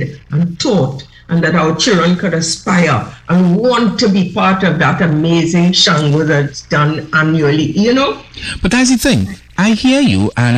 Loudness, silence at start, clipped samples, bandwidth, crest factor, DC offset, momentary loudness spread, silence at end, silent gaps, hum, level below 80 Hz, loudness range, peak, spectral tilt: -12 LUFS; 0 s; under 0.1%; 14 kHz; 12 dB; under 0.1%; 7 LU; 0 s; none; none; -36 dBFS; 2 LU; 0 dBFS; -5 dB/octave